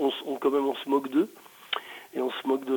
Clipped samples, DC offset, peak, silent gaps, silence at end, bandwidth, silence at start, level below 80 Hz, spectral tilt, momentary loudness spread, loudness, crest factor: under 0.1%; under 0.1%; -12 dBFS; none; 0 s; 19.5 kHz; 0 s; -84 dBFS; -4.5 dB/octave; 8 LU; -29 LUFS; 16 dB